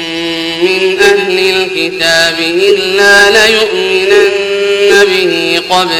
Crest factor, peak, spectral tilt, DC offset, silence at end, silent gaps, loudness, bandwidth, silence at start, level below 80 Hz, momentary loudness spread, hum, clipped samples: 8 dB; 0 dBFS; -2.5 dB/octave; under 0.1%; 0 s; none; -8 LUFS; 17 kHz; 0 s; -44 dBFS; 7 LU; none; 2%